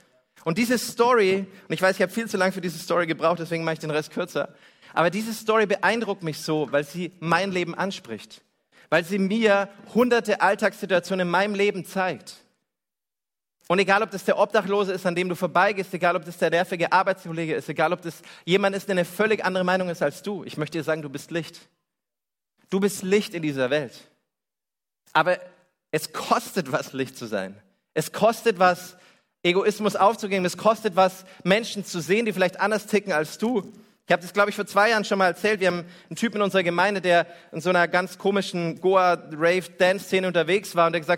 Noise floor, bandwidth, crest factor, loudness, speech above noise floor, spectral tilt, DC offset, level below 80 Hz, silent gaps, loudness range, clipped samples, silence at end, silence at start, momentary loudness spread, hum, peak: under -90 dBFS; 16.5 kHz; 20 dB; -24 LUFS; over 67 dB; -5 dB/octave; under 0.1%; -70 dBFS; none; 5 LU; under 0.1%; 0 s; 0.45 s; 10 LU; none; -4 dBFS